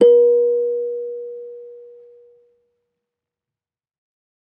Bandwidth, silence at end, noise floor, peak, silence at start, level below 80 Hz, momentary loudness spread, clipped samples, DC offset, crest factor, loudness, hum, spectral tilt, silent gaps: 3.2 kHz; 2.6 s; -90 dBFS; -2 dBFS; 0 s; -84 dBFS; 24 LU; under 0.1%; under 0.1%; 18 dB; -17 LUFS; none; -7 dB/octave; none